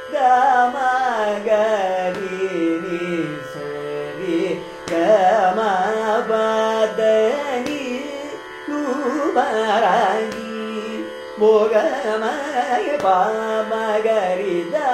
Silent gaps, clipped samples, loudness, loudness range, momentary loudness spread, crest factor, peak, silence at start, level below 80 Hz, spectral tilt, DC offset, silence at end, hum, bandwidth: none; under 0.1%; -19 LUFS; 4 LU; 12 LU; 16 dB; -4 dBFS; 0 s; -60 dBFS; -4.5 dB/octave; under 0.1%; 0 s; none; 14.5 kHz